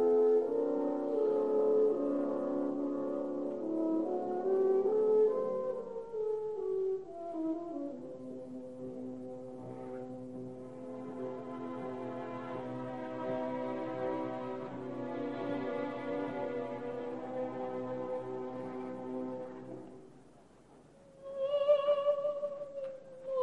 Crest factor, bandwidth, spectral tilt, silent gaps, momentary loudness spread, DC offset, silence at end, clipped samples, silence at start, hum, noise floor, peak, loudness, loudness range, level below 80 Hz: 18 dB; 7.8 kHz; -8 dB/octave; none; 16 LU; 0.1%; 0 s; under 0.1%; 0 s; none; -60 dBFS; -18 dBFS; -35 LUFS; 11 LU; -74 dBFS